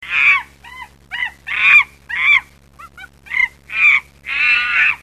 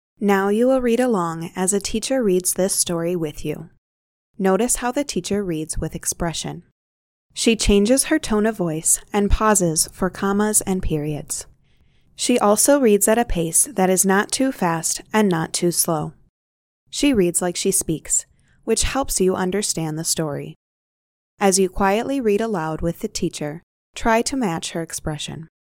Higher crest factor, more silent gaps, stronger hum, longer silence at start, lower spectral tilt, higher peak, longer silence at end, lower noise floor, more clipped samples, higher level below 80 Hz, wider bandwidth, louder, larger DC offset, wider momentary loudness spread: about the same, 16 dB vs 18 dB; second, none vs 3.78-4.34 s, 6.71-7.29 s, 16.29-16.87 s, 20.56-21.37 s, 23.63-23.93 s; first, 60 Hz at -60 dBFS vs none; second, 0 s vs 0.2 s; second, -0.5 dB/octave vs -4 dB/octave; about the same, 0 dBFS vs -2 dBFS; second, 0.05 s vs 0.3 s; second, -42 dBFS vs -57 dBFS; neither; second, -50 dBFS vs -36 dBFS; second, 13.5 kHz vs 17 kHz; first, -13 LUFS vs -20 LUFS; first, 0.1% vs under 0.1%; first, 14 LU vs 11 LU